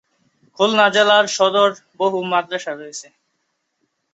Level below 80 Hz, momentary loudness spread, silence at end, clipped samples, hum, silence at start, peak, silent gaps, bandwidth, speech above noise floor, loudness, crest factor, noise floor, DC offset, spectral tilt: -70 dBFS; 16 LU; 1.1 s; under 0.1%; none; 0.6 s; -2 dBFS; none; 8.2 kHz; 54 dB; -17 LUFS; 18 dB; -72 dBFS; under 0.1%; -2.5 dB/octave